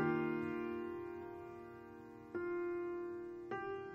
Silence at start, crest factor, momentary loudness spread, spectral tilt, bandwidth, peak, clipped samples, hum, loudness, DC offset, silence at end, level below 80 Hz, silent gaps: 0 s; 18 dB; 14 LU; -8.5 dB/octave; 5.6 kHz; -24 dBFS; under 0.1%; none; -43 LUFS; under 0.1%; 0 s; -74 dBFS; none